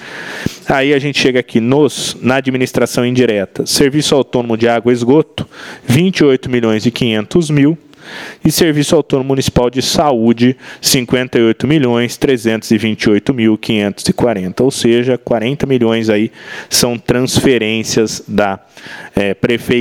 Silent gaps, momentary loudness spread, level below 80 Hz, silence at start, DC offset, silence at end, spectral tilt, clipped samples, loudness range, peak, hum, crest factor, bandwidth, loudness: none; 6 LU; -40 dBFS; 0 s; under 0.1%; 0 s; -5 dB/octave; under 0.1%; 1 LU; 0 dBFS; none; 12 dB; 17.5 kHz; -13 LUFS